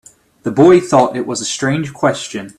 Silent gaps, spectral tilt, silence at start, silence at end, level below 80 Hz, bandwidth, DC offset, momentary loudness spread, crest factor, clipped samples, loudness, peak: none; -5 dB/octave; 0.45 s; 0.1 s; -52 dBFS; 12 kHz; under 0.1%; 12 LU; 14 dB; under 0.1%; -14 LUFS; 0 dBFS